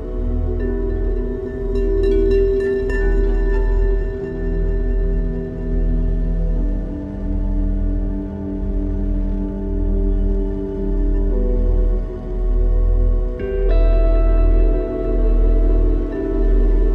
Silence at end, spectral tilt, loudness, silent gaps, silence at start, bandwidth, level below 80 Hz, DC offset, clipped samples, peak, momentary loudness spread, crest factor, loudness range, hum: 0 s; -10 dB/octave; -21 LUFS; none; 0 s; 4.1 kHz; -18 dBFS; under 0.1%; under 0.1%; -6 dBFS; 7 LU; 12 dB; 4 LU; none